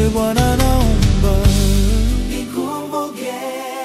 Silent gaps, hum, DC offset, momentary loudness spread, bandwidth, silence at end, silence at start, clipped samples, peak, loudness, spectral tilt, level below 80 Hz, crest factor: none; none; under 0.1%; 10 LU; 16 kHz; 0 s; 0 s; under 0.1%; -2 dBFS; -17 LUFS; -5.5 dB/octave; -18 dBFS; 14 dB